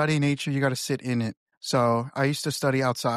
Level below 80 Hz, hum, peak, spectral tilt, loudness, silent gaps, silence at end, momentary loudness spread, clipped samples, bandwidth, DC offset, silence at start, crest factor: -64 dBFS; none; -12 dBFS; -5.5 dB/octave; -26 LUFS; 1.37-1.47 s, 1.57-1.61 s; 0 s; 6 LU; under 0.1%; 14.5 kHz; under 0.1%; 0 s; 14 dB